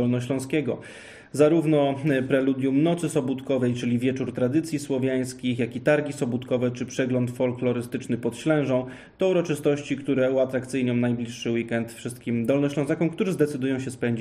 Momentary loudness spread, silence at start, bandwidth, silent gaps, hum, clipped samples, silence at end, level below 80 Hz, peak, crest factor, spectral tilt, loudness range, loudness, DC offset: 6 LU; 0 s; 14.5 kHz; none; none; under 0.1%; 0 s; -62 dBFS; -6 dBFS; 18 dB; -6.5 dB/octave; 3 LU; -25 LUFS; under 0.1%